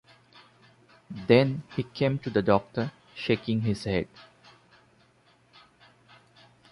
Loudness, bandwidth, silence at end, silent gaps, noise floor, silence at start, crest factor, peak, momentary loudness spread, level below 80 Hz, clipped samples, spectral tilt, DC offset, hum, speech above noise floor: -27 LUFS; 11.5 kHz; 2.5 s; none; -62 dBFS; 1.1 s; 22 dB; -6 dBFS; 14 LU; -56 dBFS; under 0.1%; -7.5 dB/octave; under 0.1%; none; 36 dB